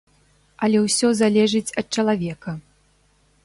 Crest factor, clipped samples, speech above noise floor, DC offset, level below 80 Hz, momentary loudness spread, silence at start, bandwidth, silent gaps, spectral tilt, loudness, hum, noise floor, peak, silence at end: 16 dB; under 0.1%; 41 dB; under 0.1%; -58 dBFS; 15 LU; 0.6 s; 11.5 kHz; none; -4.5 dB/octave; -20 LUFS; 50 Hz at -55 dBFS; -60 dBFS; -6 dBFS; 0.85 s